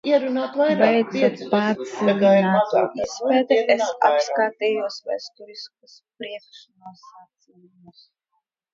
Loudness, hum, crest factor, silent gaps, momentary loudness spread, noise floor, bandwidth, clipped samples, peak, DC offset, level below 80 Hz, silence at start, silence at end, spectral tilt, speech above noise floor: -20 LUFS; none; 20 dB; none; 20 LU; -75 dBFS; 7.6 kHz; under 0.1%; -2 dBFS; under 0.1%; -68 dBFS; 0.05 s; 1.8 s; -5.5 dB/octave; 54 dB